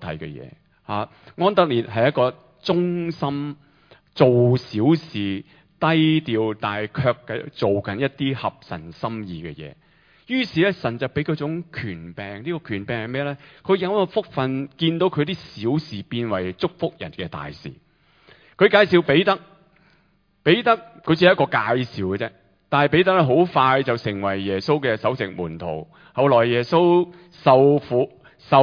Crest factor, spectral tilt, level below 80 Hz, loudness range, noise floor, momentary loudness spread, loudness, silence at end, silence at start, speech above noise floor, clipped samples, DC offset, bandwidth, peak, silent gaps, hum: 20 dB; -8 dB/octave; -56 dBFS; 7 LU; -62 dBFS; 15 LU; -21 LUFS; 0 s; 0 s; 41 dB; under 0.1%; under 0.1%; 5.2 kHz; 0 dBFS; none; none